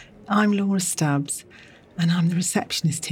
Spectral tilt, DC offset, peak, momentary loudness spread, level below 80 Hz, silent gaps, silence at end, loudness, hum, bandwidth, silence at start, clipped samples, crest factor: -4.5 dB/octave; under 0.1%; -6 dBFS; 7 LU; -64 dBFS; none; 0 s; -23 LUFS; none; 16.5 kHz; 0 s; under 0.1%; 16 dB